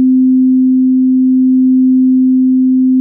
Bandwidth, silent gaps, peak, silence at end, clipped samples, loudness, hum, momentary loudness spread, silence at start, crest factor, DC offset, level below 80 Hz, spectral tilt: 0.4 kHz; none; -4 dBFS; 0 s; under 0.1%; -9 LUFS; none; 1 LU; 0 s; 4 dB; under 0.1%; -72 dBFS; -17.5 dB/octave